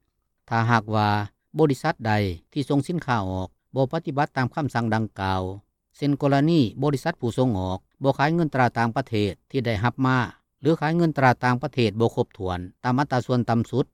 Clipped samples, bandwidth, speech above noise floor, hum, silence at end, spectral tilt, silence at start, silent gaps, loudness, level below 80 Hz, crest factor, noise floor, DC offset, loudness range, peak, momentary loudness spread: under 0.1%; 14 kHz; 38 dB; none; 0.1 s; -7.5 dB/octave; 0.5 s; none; -24 LUFS; -56 dBFS; 18 dB; -61 dBFS; under 0.1%; 3 LU; -6 dBFS; 8 LU